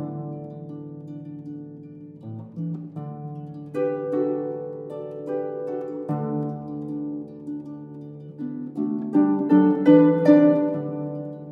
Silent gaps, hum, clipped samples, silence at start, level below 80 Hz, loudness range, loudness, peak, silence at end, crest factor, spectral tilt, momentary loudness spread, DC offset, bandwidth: none; none; under 0.1%; 0 s; -70 dBFS; 15 LU; -23 LUFS; -4 dBFS; 0 s; 20 dB; -10.5 dB/octave; 22 LU; under 0.1%; 4.9 kHz